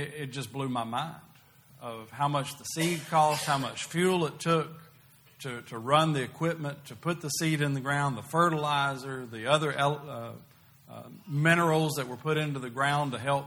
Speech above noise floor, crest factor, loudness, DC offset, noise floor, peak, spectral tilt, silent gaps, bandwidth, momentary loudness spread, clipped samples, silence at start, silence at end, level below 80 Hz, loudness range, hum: 29 dB; 22 dB; -29 LUFS; under 0.1%; -58 dBFS; -8 dBFS; -5 dB/octave; none; over 20 kHz; 15 LU; under 0.1%; 0 s; 0 s; -68 dBFS; 2 LU; none